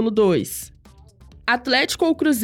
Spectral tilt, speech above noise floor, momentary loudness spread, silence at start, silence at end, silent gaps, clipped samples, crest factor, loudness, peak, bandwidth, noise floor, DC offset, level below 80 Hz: -4 dB/octave; 29 dB; 13 LU; 0 s; 0 s; none; under 0.1%; 14 dB; -20 LUFS; -6 dBFS; 18 kHz; -48 dBFS; under 0.1%; -50 dBFS